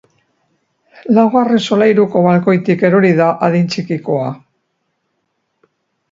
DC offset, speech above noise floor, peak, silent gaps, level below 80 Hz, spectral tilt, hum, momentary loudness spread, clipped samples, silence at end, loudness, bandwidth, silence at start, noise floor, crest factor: under 0.1%; 56 dB; 0 dBFS; none; -60 dBFS; -7.5 dB/octave; none; 9 LU; under 0.1%; 1.75 s; -13 LUFS; 7.8 kHz; 1.05 s; -68 dBFS; 14 dB